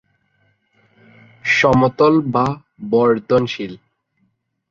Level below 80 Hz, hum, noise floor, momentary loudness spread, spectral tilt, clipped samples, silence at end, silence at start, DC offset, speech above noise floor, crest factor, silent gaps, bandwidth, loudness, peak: -48 dBFS; none; -66 dBFS; 13 LU; -6.5 dB/octave; under 0.1%; 0.95 s; 1.45 s; under 0.1%; 50 dB; 16 dB; none; 7.4 kHz; -16 LUFS; -2 dBFS